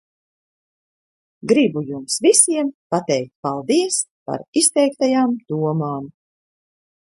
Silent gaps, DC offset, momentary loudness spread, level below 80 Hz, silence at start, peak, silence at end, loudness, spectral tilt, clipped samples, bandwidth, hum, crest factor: 2.74-2.90 s, 3.35-3.43 s, 4.11-4.26 s, 4.48-4.53 s; under 0.1%; 13 LU; -68 dBFS; 1.45 s; 0 dBFS; 1.1 s; -18 LUFS; -3.5 dB/octave; under 0.1%; 12 kHz; none; 20 dB